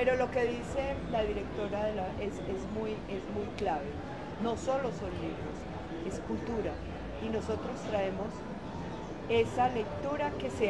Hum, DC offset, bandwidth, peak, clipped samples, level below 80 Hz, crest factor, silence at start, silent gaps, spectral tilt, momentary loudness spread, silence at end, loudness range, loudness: none; 0.2%; 11.5 kHz; -16 dBFS; under 0.1%; -48 dBFS; 18 dB; 0 s; none; -6 dB/octave; 10 LU; 0 s; 3 LU; -35 LUFS